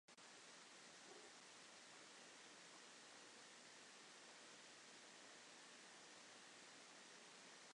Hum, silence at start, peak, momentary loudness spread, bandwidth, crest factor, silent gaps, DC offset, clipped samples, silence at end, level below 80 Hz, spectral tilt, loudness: none; 0.1 s; -50 dBFS; 0 LU; 11 kHz; 14 dB; none; under 0.1%; under 0.1%; 0 s; under -90 dBFS; -0.5 dB/octave; -61 LUFS